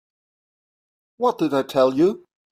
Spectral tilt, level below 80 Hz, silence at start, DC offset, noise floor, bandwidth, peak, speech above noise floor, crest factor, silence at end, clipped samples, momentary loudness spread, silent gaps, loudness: -6.5 dB/octave; -66 dBFS; 1.2 s; under 0.1%; under -90 dBFS; 15.5 kHz; -4 dBFS; over 71 dB; 18 dB; 0.35 s; under 0.1%; 6 LU; none; -20 LUFS